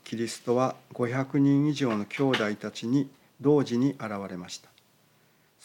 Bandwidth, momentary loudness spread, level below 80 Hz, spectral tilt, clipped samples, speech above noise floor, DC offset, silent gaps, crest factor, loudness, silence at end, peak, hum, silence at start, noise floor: 12.5 kHz; 13 LU; -82 dBFS; -6.5 dB/octave; under 0.1%; 37 dB; under 0.1%; none; 16 dB; -28 LUFS; 1.1 s; -12 dBFS; none; 0.05 s; -64 dBFS